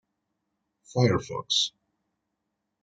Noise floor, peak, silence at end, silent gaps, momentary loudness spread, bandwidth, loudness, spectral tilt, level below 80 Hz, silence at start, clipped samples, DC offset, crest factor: -81 dBFS; -8 dBFS; 1.15 s; none; 6 LU; 9.2 kHz; -26 LUFS; -4.5 dB/octave; -64 dBFS; 0.95 s; under 0.1%; under 0.1%; 24 dB